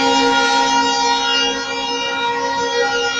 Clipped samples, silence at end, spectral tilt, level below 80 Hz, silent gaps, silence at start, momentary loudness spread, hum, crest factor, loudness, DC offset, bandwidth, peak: under 0.1%; 0 s; -1 dB/octave; -52 dBFS; none; 0 s; 6 LU; none; 14 dB; -16 LUFS; under 0.1%; 11 kHz; -2 dBFS